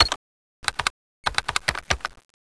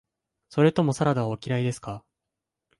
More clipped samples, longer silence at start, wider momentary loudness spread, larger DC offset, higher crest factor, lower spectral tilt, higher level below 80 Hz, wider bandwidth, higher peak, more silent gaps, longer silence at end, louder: neither; second, 0 s vs 0.55 s; second, 7 LU vs 15 LU; neither; about the same, 24 dB vs 20 dB; second, -1.5 dB/octave vs -7 dB/octave; first, -42 dBFS vs -60 dBFS; about the same, 11 kHz vs 11.5 kHz; first, -2 dBFS vs -6 dBFS; first, 0.16-0.63 s, 0.90-1.24 s vs none; second, 0.4 s vs 0.8 s; about the same, -26 LUFS vs -25 LUFS